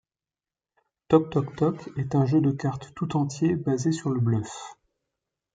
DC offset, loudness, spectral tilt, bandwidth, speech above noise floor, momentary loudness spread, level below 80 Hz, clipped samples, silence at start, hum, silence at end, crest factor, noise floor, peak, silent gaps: under 0.1%; -26 LUFS; -7.5 dB/octave; 9.2 kHz; over 65 dB; 11 LU; -60 dBFS; under 0.1%; 1.1 s; none; 0.8 s; 20 dB; under -90 dBFS; -6 dBFS; none